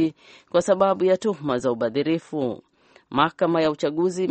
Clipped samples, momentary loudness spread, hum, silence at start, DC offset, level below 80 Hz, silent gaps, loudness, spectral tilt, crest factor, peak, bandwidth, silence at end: under 0.1%; 9 LU; none; 0 s; under 0.1%; -62 dBFS; none; -23 LUFS; -6 dB/octave; 20 dB; -4 dBFS; 8.4 kHz; 0 s